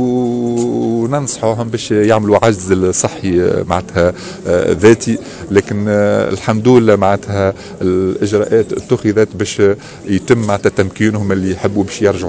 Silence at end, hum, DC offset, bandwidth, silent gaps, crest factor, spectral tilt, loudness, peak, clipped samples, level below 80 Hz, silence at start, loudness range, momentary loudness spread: 0 s; none; under 0.1%; 8 kHz; none; 14 dB; -6 dB/octave; -14 LUFS; 0 dBFS; 0.5%; -36 dBFS; 0 s; 2 LU; 7 LU